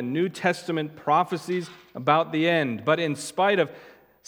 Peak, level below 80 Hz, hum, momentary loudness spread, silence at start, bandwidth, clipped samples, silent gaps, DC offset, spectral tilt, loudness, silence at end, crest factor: -4 dBFS; -74 dBFS; none; 8 LU; 0 s; 17.5 kHz; under 0.1%; none; under 0.1%; -5.5 dB/octave; -25 LUFS; 0.4 s; 20 dB